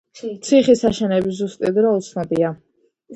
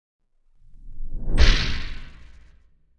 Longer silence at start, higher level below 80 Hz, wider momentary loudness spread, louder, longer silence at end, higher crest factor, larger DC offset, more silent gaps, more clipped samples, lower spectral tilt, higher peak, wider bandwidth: second, 0.15 s vs 0.85 s; second, -52 dBFS vs -24 dBFS; second, 12 LU vs 23 LU; first, -18 LUFS vs -24 LUFS; second, 0 s vs 0.9 s; second, 16 dB vs 22 dB; neither; neither; neither; first, -6 dB/octave vs -4 dB/octave; about the same, -2 dBFS vs -2 dBFS; first, 10.5 kHz vs 8.8 kHz